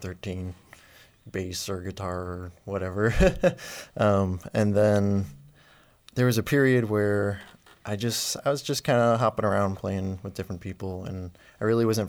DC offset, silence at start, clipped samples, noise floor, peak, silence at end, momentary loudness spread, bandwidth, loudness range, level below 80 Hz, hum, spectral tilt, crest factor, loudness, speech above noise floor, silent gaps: under 0.1%; 0 s; under 0.1%; -57 dBFS; -8 dBFS; 0 s; 15 LU; over 20 kHz; 4 LU; -42 dBFS; none; -5.5 dB/octave; 18 dB; -26 LUFS; 32 dB; none